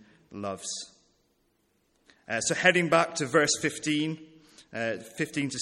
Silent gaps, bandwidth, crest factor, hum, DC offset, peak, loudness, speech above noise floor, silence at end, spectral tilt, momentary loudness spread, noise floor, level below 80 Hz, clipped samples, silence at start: none; 15 kHz; 24 dB; none; under 0.1%; -6 dBFS; -27 LUFS; 44 dB; 0 s; -3 dB/octave; 16 LU; -71 dBFS; -70 dBFS; under 0.1%; 0.3 s